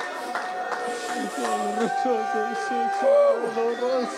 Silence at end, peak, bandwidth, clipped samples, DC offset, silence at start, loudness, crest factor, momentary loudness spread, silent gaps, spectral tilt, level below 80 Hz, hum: 0 s; -10 dBFS; 14 kHz; under 0.1%; under 0.1%; 0 s; -25 LUFS; 14 dB; 10 LU; none; -3.5 dB/octave; -76 dBFS; none